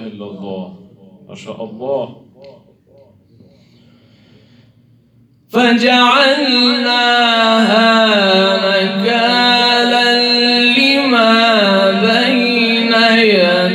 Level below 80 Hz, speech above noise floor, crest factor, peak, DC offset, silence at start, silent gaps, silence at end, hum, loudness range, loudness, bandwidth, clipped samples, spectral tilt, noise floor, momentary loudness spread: -66 dBFS; 38 dB; 14 dB; 0 dBFS; under 0.1%; 0 s; none; 0 s; none; 18 LU; -10 LUFS; 13 kHz; under 0.1%; -4 dB/octave; -51 dBFS; 16 LU